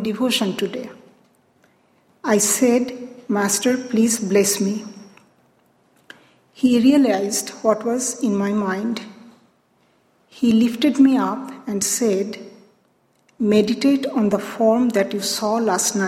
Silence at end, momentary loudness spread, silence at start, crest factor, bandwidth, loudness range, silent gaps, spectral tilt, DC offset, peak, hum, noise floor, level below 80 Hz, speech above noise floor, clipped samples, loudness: 0 s; 13 LU; 0 s; 18 dB; 16.5 kHz; 3 LU; none; -4 dB/octave; under 0.1%; -4 dBFS; none; -62 dBFS; -64 dBFS; 43 dB; under 0.1%; -19 LUFS